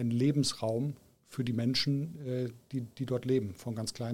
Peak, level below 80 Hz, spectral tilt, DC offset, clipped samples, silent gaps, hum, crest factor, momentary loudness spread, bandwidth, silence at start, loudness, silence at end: -18 dBFS; -66 dBFS; -6 dB/octave; under 0.1%; under 0.1%; none; none; 16 dB; 10 LU; 16 kHz; 0 s; -33 LUFS; 0 s